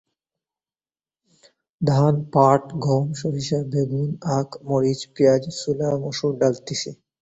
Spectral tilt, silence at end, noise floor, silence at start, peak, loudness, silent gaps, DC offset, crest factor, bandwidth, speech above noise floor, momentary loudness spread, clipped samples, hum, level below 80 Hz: -6.5 dB/octave; 0.25 s; under -90 dBFS; 1.8 s; -2 dBFS; -22 LUFS; none; under 0.1%; 20 dB; 8 kHz; over 69 dB; 8 LU; under 0.1%; none; -58 dBFS